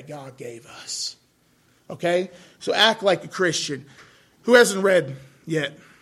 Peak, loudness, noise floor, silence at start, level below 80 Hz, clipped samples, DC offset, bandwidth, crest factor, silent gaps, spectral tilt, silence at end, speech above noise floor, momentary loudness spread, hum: -2 dBFS; -21 LUFS; -61 dBFS; 0 s; -68 dBFS; under 0.1%; under 0.1%; 15 kHz; 20 dB; none; -3 dB/octave; 0.25 s; 39 dB; 22 LU; none